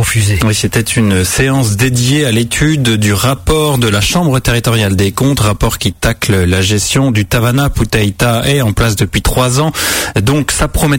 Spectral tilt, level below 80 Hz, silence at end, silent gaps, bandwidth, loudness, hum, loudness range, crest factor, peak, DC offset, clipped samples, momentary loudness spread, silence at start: -4.5 dB/octave; -24 dBFS; 0 s; none; 16.5 kHz; -11 LUFS; none; 1 LU; 10 dB; 0 dBFS; under 0.1%; under 0.1%; 2 LU; 0 s